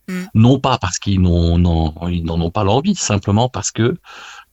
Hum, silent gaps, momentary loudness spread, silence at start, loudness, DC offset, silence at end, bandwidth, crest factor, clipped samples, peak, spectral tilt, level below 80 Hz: none; none; 7 LU; 0.1 s; -16 LUFS; under 0.1%; 0.1 s; 8.2 kHz; 16 dB; under 0.1%; 0 dBFS; -5.5 dB/octave; -30 dBFS